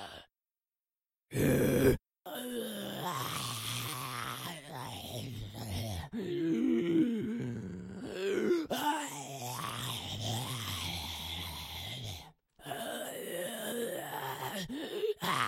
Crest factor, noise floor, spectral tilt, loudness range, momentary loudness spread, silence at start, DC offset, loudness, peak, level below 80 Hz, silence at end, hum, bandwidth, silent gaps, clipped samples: 22 dB; under -90 dBFS; -4.5 dB/octave; 6 LU; 12 LU; 0 s; under 0.1%; -36 LUFS; -14 dBFS; -58 dBFS; 0 s; none; 16.5 kHz; none; under 0.1%